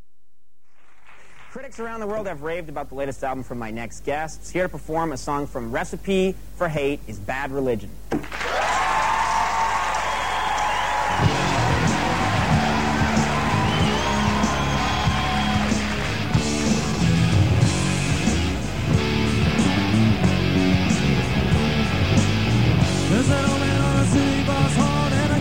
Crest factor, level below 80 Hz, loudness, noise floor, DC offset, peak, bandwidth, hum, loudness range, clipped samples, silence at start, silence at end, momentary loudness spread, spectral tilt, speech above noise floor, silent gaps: 16 dB; -34 dBFS; -22 LUFS; -70 dBFS; 2%; -6 dBFS; 16.5 kHz; none; 8 LU; under 0.1%; 1.5 s; 0 s; 10 LU; -5.5 dB/octave; 43 dB; none